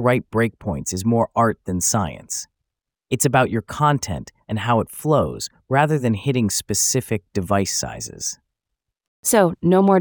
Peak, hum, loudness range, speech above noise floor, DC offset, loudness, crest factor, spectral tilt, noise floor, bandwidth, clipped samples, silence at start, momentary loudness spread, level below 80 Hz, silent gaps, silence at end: -2 dBFS; none; 2 LU; 62 dB; under 0.1%; -20 LUFS; 18 dB; -4.5 dB/octave; -82 dBFS; over 20 kHz; under 0.1%; 0 s; 11 LU; -50 dBFS; 9.08-9.23 s; 0 s